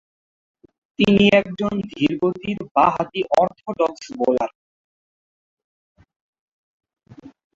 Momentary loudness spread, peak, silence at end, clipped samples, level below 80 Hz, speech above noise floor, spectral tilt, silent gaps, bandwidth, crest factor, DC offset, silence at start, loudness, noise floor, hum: 10 LU; -2 dBFS; 0.25 s; under 0.1%; -54 dBFS; over 71 dB; -6.5 dB/octave; 2.71-2.75 s, 4.55-5.57 s, 5.64-5.95 s, 6.16-6.33 s, 6.39-6.80 s; 7.6 kHz; 20 dB; under 0.1%; 1 s; -20 LUFS; under -90 dBFS; none